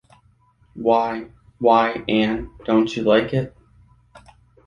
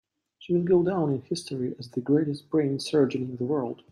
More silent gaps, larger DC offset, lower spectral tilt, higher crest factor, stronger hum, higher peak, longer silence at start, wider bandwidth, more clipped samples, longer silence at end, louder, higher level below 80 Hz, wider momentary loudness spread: neither; neither; about the same, -7 dB/octave vs -7 dB/octave; about the same, 20 dB vs 16 dB; neither; first, -2 dBFS vs -10 dBFS; first, 0.75 s vs 0.4 s; second, 7.4 kHz vs 12 kHz; neither; first, 0.5 s vs 0.15 s; first, -20 LUFS vs -27 LUFS; first, -50 dBFS vs -66 dBFS; about the same, 10 LU vs 9 LU